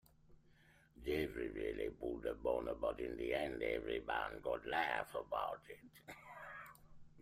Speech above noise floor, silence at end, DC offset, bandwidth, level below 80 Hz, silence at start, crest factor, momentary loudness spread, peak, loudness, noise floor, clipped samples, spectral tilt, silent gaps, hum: 26 dB; 0 s; under 0.1%; 15.5 kHz; -62 dBFS; 0.3 s; 20 dB; 15 LU; -22 dBFS; -42 LUFS; -69 dBFS; under 0.1%; -5.5 dB/octave; none; none